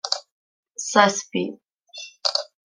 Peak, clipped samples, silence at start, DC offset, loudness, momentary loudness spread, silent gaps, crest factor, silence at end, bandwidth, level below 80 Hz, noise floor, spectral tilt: -2 dBFS; under 0.1%; 0.05 s; under 0.1%; -22 LUFS; 20 LU; 0.32-0.63 s, 1.74-1.78 s; 24 dB; 0.2 s; 12 kHz; -76 dBFS; -42 dBFS; -2.5 dB/octave